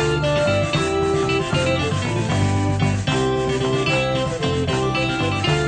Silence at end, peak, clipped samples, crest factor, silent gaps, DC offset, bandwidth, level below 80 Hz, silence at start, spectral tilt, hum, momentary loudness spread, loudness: 0 s; -6 dBFS; under 0.1%; 12 dB; none; under 0.1%; 9.4 kHz; -38 dBFS; 0 s; -5.5 dB/octave; none; 2 LU; -20 LUFS